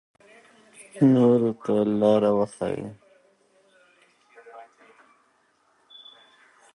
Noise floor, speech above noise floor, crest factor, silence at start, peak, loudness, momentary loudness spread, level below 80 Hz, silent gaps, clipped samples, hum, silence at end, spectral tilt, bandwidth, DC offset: -65 dBFS; 44 dB; 18 dB; 0.8 s; -8 dBFS; -22 LUFS; 25 LU; -66 dBFS; none; under 0.1%; none; 2.1 s; -8 dB/octave; 11 kHz; under 0.1%